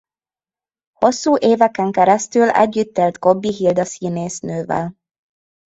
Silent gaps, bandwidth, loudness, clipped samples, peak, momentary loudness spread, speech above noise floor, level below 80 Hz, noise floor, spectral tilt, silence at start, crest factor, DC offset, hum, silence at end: none; 8.2 kHz; -17 LUFS; under 0.1%; 0 dBFS; 9 LU; over 74 dB; -58 dBFS; under -90 dBFS; -5.5 dB/octave; 1 s; 18 dB; under 0.1%; none; 0.75 s